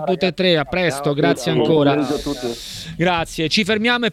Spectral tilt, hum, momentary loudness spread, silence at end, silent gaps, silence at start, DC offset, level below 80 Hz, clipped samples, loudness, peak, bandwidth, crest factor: -5 dB/octave; none; 9 LU; 0 s; none; 0 s; under 0.1%; -44 dBFS; under 0.1%; -18 LUFS; -2 dBFS; 15.5 kHz; 16 dB